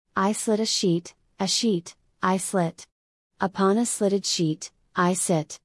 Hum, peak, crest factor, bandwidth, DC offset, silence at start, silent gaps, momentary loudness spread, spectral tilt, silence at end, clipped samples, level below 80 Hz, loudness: none; -8 dBFS; 16 dB; 12 kHz; under 0.1%; 0.15 s; 2.92-3.30 s; 8 LU; -4 dB/octave; 0.1 s; under 0.1%; -68 dBFS; -24 LUFS